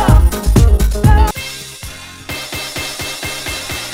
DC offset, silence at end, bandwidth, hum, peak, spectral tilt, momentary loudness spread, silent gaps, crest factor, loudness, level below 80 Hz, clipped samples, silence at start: under 0.1%; 0 s; 16.5 kHz; none; 0 dBFS; -5 dB/octave; 16 LU; none; 14 dB; -15 LUFS; -16 dBFS; 0.3%; 0 s